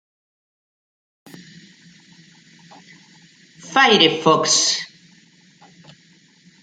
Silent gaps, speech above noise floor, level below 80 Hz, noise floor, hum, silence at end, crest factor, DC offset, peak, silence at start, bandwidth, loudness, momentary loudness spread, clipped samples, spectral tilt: none; 38 dB; -70 dBFS; -53 dBFS; none; 1.75 s; 22 dB; under 0.1%; -2 dBFS; 3.65 s; 10.5 kHz; -15 LUFS; 11 LU; under 0.1%; -2 dB/octave